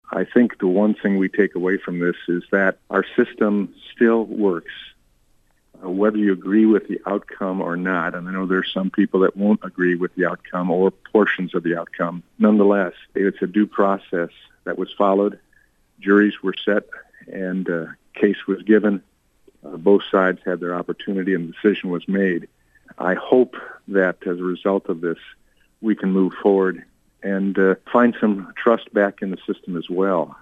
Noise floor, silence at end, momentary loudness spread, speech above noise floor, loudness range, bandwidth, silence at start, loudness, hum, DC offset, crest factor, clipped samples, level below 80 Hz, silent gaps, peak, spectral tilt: -60 dBFS; 0.1 s; 10 LU; 40 dB; 3 LU; 3.9 kHz; 0.1 s; -20 LUFS; none; under 0.1%; 18 dB; under 0.1%; -62 dBFS; none; -4 dBFS; -9 dB/octave